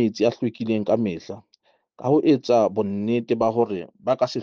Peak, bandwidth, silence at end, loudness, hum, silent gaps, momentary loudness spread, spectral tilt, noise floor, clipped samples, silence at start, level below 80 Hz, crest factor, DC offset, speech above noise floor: -6 dBFS; 7.2 kHz; 0 s; -22 LUFS; none; none; 11 LU; -7 dB/octave; -64 dBFS; under 0.1%; 0 s; -66 dBFS; 16 dB; under 0.1%; 42 dB